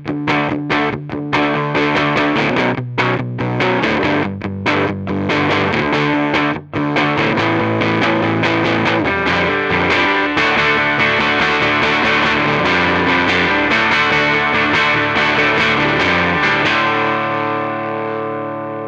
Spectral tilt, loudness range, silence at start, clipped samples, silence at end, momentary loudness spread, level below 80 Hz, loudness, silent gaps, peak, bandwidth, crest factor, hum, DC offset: -5.5 dB/octave; 4 LU; 0 s; under 0.1%; 0 s; 7 LU; -44 dBFS; -15 LUFS; none; 0 dBFS; 9.2 kHz; 16 dB; none; under 0.1%